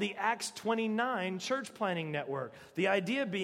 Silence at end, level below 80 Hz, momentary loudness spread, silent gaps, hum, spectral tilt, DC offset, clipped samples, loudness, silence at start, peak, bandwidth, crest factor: 0 s; -80 dBFS; 6 LU; none; none; -4.5 dB/octave; under 0.1%; under 0.1%; -34 LUFS; 0 s; -16 dBFS; 16 kHz; 18 dB